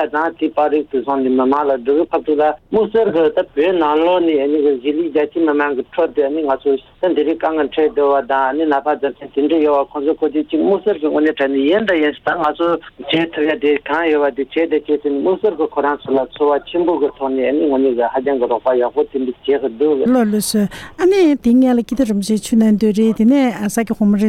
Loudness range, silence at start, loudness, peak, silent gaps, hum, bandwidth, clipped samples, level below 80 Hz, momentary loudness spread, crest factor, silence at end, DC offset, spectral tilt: 2 LU; 0 s; -16 LUFS; -4 dBFS; none; none; 15 kHz; under 0.1%; -50 dBFS; 5 LU; 12 dB; 0 s; under 0.1%; -5.5 dB/octave